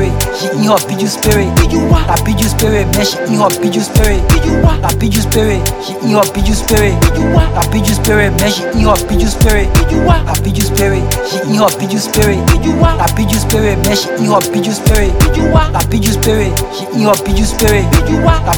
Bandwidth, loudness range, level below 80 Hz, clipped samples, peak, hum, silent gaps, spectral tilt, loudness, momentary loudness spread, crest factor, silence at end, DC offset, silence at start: 19 kHz; 1 LU; -16 dBFS; under 0.1%; 0 dBFS; none; none; -5 dB/octave; -11 LUFS; 4 LU; 10 dB; 0 s; under 0.1%; 0 s